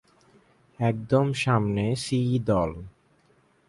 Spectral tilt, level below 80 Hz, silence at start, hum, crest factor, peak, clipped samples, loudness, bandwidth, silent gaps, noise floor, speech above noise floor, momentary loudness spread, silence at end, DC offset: -6.5 dB/octave; -50 dBFS; 0.8 s; none; 18 dB; -8 dBFS; under 0.1%; -25 LUFS; 11.5 kHz; none; -63 dBFS; 39 dB; 5 LU; 0.8 s; under 0.1%